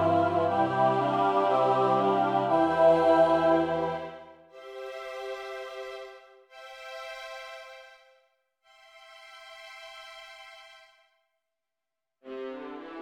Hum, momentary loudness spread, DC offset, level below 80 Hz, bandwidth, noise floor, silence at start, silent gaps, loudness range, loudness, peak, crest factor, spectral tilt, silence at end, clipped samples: none; 25 LU; under 0.1%; -68 dBFS; 10.5 kHz; -89 dBFS; 0 s; none; 24 LU; -25 LUFS; -10 dBFS; 18 dB; -6.5 dB/octave; 0 s; under 0.1%